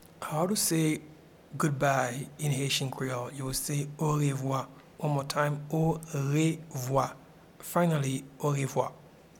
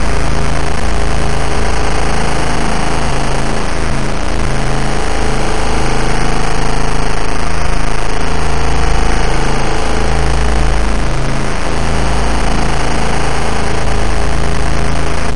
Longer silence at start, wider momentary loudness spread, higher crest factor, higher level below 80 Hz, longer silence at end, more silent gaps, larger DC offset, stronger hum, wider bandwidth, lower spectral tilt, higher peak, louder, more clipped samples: first, 0.2 s vs 0 s; first, 8 LU vs 2 LU; first, 18 dB vs 10 dB; second, -60 dBFS vs -16 dBFS; first, 0.3 s vs 0 s; neither; second, under 0.1% vs 30%; neither; first, 18 kHz vs 11.5 kHz; about the same, -5 dB/octave vs -5 dB/octave; second, -12 dBFS vs 0 dBFS; second, -30 LUFS vs -16 LUFS; neither